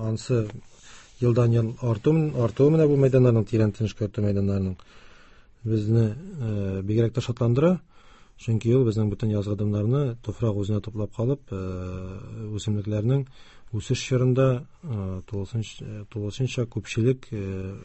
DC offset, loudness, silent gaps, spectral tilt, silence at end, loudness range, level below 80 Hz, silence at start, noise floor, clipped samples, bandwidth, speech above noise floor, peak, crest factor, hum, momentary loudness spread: under 0.1%; -25 LUFS; none; -8 dB/octave; 0 s; 7 LU; -46 dBFS; 0 s; -51 dBFS; under 0.1%; 8.4 kHz; 27 dB; -8 dBFS; 18 dB; none; 13 LU